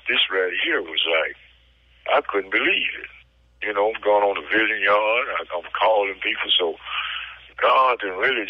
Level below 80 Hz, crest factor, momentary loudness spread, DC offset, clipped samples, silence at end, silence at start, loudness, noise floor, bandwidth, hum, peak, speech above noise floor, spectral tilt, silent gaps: -58 dBFS; 12 dB; 11 LU; under 0.1%; under 0.1%; 0 s; 0.05 s; -21 LUFS; -56 dBFS; 5.6 kHz; none; -10 dBFS; 34 dB; -4.5 dB/octave; none